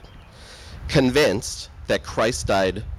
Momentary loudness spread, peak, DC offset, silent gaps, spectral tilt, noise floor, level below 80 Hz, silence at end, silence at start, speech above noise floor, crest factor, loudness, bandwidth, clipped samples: 18 LU; -6 dBFS; under 0.1%; none; -4.5 dB/octave; -44 dBFS; -38 dBFS; 0 s; 0.05 s; 22 dB; 16 dB; -21 LUFS; 15.5 kHz; under 0.1%